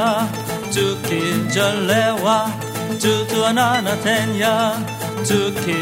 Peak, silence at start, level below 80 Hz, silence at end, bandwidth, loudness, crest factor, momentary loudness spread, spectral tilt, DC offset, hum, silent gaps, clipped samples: -2 dBFS; 0 s; -54 dBFS; 0 s; 16.5 kHz; -18 LUFS; 16 dB; 7 LU; -4 dB/octave; under 0.1%; none; none; under 0.1%